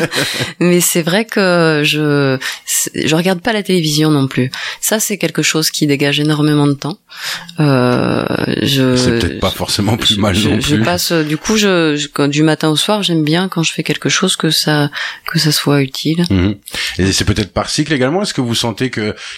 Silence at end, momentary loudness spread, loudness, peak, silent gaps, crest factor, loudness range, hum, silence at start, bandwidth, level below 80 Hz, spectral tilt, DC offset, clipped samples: 0 s; 6 LU; -14 LUFS; 0 dBFS; none; 12 dB; 2 LU; none; 0 s; 16.5 kHz; -40 dBFS; -4 dB/octave; under 0.1%; under 0.1%